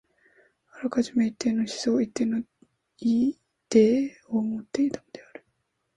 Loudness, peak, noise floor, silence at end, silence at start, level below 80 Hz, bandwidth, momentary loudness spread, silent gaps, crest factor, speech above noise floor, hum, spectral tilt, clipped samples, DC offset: -26 LUFS; -6 dBFS; -75 dBFS; 0.75 s; 0.75 s; -66 dBFS; 10.5 kHz; 16 LU; none; 20 dB; 51 dB; none; -5.5 dB/octave; under 0.1%; under 0.1%